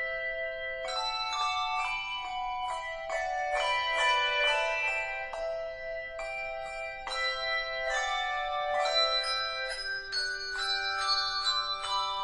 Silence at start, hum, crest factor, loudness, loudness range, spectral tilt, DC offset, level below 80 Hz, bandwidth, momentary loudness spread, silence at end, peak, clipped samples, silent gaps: 0 s; none; 16 dB; -30 LUFS; 4 LU; 0.5 dB/octave; under 0.1%; -54 dBFS; 10.5 kHz; 10 LU; 0 s; -16 dBFS; under 0.1%; none